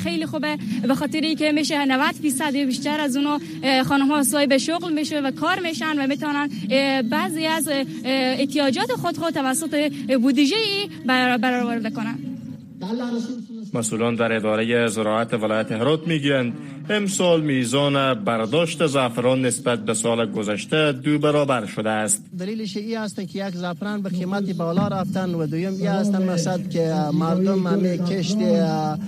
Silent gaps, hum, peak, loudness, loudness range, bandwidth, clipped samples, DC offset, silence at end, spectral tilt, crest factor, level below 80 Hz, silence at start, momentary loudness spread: none; none; -6 dBFS; -22 LUFS; 4 LU; 15 kHz; under 0.1%; under 0.1%; 0 s; -4.5 dB/octave; 14 dB; -64 dBFS; 0 s; 8 LU